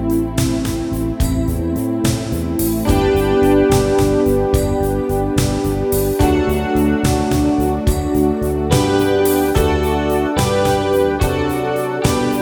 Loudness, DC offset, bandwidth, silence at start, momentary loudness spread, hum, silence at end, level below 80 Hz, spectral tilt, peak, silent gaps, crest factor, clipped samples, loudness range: -16 LUFS; under 0.1%; over 20 kHz; 0 s; 5 LU; none; 0 s; -26 dBFS; -6 dB/octave; 0 dBFS; none; 16 dB; under 0.1%; 1 LU